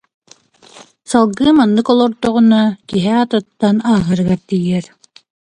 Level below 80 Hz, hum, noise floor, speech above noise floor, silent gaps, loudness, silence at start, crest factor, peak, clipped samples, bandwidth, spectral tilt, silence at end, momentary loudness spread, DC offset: -48 dBFS; none; -47 dBFS; 34 dB; none; -14 LUFS; 1.1 s; 14 dB; 0 dBFS; under 0.1%; 10.5 kHz; -6.5 dB/octave; 0.7 s; 6 LU; under 0.1%